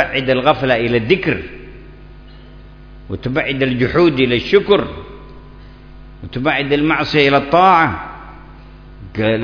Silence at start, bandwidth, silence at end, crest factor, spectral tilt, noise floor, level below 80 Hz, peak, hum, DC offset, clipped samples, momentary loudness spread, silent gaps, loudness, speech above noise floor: 0 s; 5.4 kHz; 0 s; 16 dB; -7 dB/octave; -38 dBFS; -38 dBFS; 0 dBFS; none; under 0.1%; under 0.1%; 20 LU; none; -14 LUFS; 23 dB